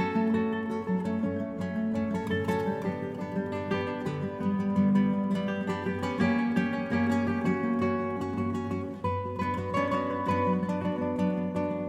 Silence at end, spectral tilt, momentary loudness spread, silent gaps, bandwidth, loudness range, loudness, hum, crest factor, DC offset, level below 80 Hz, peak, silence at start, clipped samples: 0 s; -8 dB/octave; 6 LU; none; 9.8 kHz; 3 LU; -29 LUFS; none; 16 dB; under 0.1%; -62 dBFS; -14 dBFS; 0 s; under 0.1%